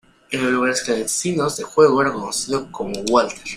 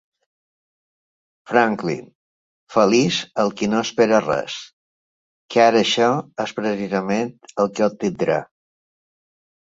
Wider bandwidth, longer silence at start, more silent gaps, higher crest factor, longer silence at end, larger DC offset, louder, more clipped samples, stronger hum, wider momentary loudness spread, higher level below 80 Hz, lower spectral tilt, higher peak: first, 16 kHz vs 7.8 kHz; second, 0.3 s vs 1.5 s; second, none vs 2.15-2.67 s, 4.73-5.49 s; about the same, 18 dB vs 20 dB; second, 0 s vs 1.2 s; neither; about the same, -19 LUFS vs -20 LUFS; neither; neither; about the same, 9 LU vs 9 LU; first, -52 dBFS vs -62 dBFS; about the same, -3.5 dB/octave vs -4.5 dB/octave; about the same, -2 dBFS vs -2 dBFS